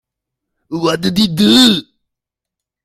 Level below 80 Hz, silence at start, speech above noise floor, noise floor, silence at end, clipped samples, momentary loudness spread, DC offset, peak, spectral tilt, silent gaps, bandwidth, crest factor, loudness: -50 dBFS; 0.7 s; 71 dB; -83 dBFS; 1.05 s; under 0.1%; 11 LU; under 0.1%; 0 dBFS; -4.5 dB/octave; none; 15.5 kHz; 16 dB; -12 LUFS